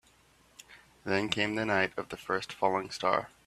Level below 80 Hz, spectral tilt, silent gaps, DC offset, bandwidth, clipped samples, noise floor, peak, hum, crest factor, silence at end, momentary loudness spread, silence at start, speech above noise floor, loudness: -66 dBFS; -4.5 dB/octave; none; under 0.1%; 14.5 kHz; under 0.1%; -64 dBFS; -10 dBFS; none; 24 dB; 0.2 s; 6 LU; 0.7 s; 32 dB; -31 LUFS